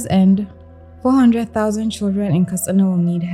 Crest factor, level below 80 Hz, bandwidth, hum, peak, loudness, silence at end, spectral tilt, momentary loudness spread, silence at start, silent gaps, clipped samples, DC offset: 12 dB; -50 dBFS; 16.5 kHz; none; -4 dBFS; -17 LUFS; 0 s; -7 dB/octave; 6 LU; 0 s; none; under 0.1%; under 0.1%